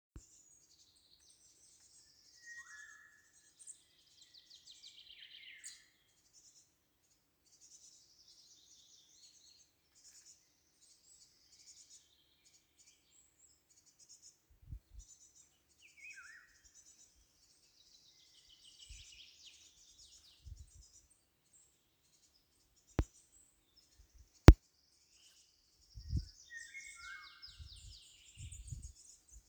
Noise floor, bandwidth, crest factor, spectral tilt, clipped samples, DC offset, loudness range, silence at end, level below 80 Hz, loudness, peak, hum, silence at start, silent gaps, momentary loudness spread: -76 dBFS; over 20 kHz; 40 dB; -6 dB/octave; under 0.1%; under 0.1%; 28 LU; 3.3 s; -46 dBFS; -35 LUFS; 0 dBFS; none; 23 s; none; 19 LU